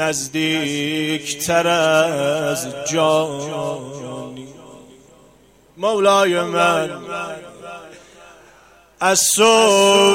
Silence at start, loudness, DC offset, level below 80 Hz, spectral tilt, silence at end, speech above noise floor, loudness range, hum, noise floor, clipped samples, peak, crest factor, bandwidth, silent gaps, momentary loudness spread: 0 s; -17 LUFS; under 0.1%; -58 dBFS; -2.5 dB/octave; 0 s; 34 dB; 5 LU; none; -51 dBFS; under 0.1%; -2 dBFS; 16 dB; 16.5 kHz; none; 19 LU